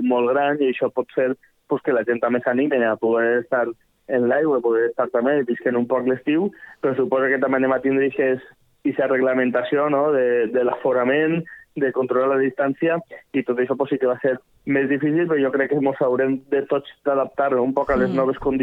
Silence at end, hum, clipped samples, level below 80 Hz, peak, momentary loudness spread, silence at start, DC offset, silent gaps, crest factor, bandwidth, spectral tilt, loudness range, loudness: 0 s; none; under 0.1%; -54 dBFS; -6 dBFS; 6 LU; 0 s; under 0.1%; none; 14 dB; 4.4 kHz; -9 dB/octave; 1 LU; -21 LUFS